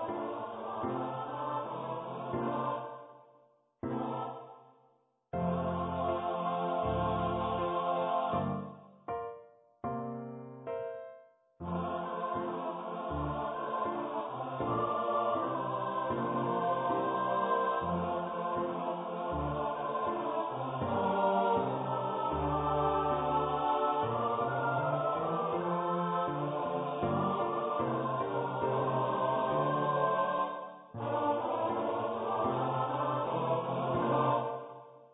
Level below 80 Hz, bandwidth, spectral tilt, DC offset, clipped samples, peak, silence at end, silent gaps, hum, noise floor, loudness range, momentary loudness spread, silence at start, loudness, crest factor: -56 dBFS; 3.9 kHz; -3.5 dB/octave; under 0.1%; under 0.1%; -16 dBFS; 0.1 s; none; none; -71 dBFS; 7 LU; 10 LU; 0 s; -34 LUFS; 18 dB